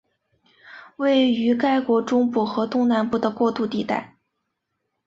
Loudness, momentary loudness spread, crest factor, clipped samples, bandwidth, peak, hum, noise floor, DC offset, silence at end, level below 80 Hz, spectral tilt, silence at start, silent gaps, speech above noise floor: -21 LUFS; 7 LU; 14 dB; under 0.1%; 7.6 kHz; -8 dBFS; none; -77 dBFS; under 0.1%; 1 s; -64 dBFS; -6 dB/octave; 0.65 s; none; 57 dB